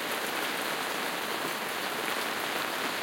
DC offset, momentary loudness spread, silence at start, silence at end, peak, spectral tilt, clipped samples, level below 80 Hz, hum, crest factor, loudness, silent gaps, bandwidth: under 0.1%; 1 LU; 0 s; 0 s; -16 dBFS; -1.5 dB/octave; under 0.1%; -82 dBFS; none; 16 dB; -31 LUFS; none; 17 kHz